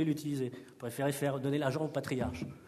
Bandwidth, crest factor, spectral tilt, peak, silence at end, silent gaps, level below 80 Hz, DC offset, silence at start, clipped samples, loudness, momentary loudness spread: 13.5 kHz; 16 dB; -6 dB/octave; -18 dBFS; 0 s; none; -60 dBFS; under 0.1%; 0 s; under 0.1%; -35 LUFS; 7 LU